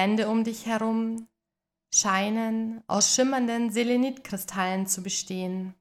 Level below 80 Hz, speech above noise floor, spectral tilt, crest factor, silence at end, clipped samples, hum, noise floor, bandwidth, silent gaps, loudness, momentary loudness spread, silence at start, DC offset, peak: -70 dBFS; 61 dB; -3 dB/octave; 18 dB; 0.1 s; under 0.1%; none; -87 dBFS; 16 kHz; none; -26 LUFS; 10 LU; 0 s; under 0.1%; -10 dBFS